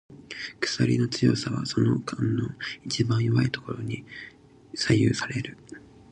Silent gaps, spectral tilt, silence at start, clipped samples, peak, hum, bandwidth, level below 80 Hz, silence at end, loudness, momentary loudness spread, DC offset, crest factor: none; -5.5 dB/octave; 0.1 s; under 0.1%; -8 dBFS; none; 10 kHz; -54 dBFS; 0.35 s; -26 LUFS; 18 LU; under 0.1%; 18 dB